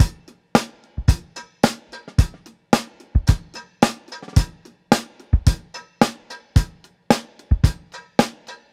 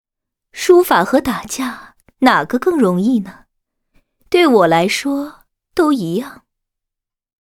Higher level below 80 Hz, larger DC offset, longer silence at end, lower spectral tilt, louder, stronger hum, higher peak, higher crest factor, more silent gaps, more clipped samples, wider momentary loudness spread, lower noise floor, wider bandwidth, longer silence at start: first, -26 dBFS vs -52 dBFS; neither; second, 0.2 s vs 1.05 s; about the same, -5.5 dB/octave vs -5 dB/octave; second, -22 LUFS vs -15 LUFS; neither; about the same, 0 dBFS vs 0 dBFS; about the same, 20 dB vs 16 dB; neither; neither; about the same, 14 LU vs 14 LU; second, -37 dBFS vs -83 dBFS; second, 16 kHz vs 18 kHz; second, 0 s vs 0.55 s